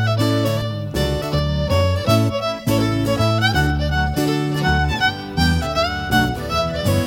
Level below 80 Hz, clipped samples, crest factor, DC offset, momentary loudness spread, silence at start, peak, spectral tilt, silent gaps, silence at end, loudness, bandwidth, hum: -30 dBFS; under 0.1%; 16 dB; under 0.1%; 4 LU; 0 s; -2 dBFS; -5.5 dB/octave; none; 0 s; -19 LUFS; 17 kHz; none